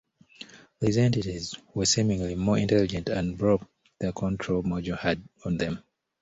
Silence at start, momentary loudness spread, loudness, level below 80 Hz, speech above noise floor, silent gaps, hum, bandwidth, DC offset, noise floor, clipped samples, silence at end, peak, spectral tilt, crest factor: 0.4 s; 11 LU; -27 LUFS; -48 dBFS; 23 dB; none; none; 8.2 kHz; under 0.1%; -49 dBFS; under 0.1%; 0.4 s; -10 dBFS; -5 dB/octave; 18 dB